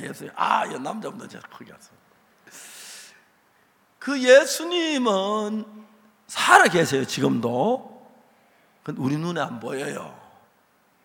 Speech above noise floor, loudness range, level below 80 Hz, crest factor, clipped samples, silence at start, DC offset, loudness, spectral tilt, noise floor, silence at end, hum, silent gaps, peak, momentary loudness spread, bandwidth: 40 dB; 12 LU; -72 dBFS; 24 dB; under 0.1%; 0 s; under 0.1%; -22 LUFS; -4 dB/octave; -62 dBFS; 0.9 s; none; none; 0 dBFS; 25 LU; 17 kHz